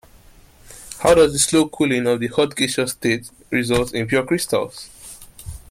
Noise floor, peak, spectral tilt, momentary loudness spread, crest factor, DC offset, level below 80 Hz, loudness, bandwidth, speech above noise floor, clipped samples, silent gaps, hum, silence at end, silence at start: -48 dBFS; -2 dBFS; -4 dB/octave; 23 LU; 18 dB; under 0.1%; -44 dBFS; -19 LUFS; 16 kHz; 29 dB; under 0.1%; none; none; 0.15 s; 0.7 s